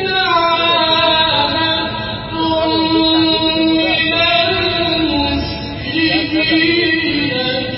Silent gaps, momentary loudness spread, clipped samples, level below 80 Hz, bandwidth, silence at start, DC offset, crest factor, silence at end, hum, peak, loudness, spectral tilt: none; 7 LU; under 0.1%; -36 dBFS; 5.8 kHz; 0 s; under 0.1%; 14 dB; 0 s; none; -2 dBFS; -13 LUFS; -9 dB/octave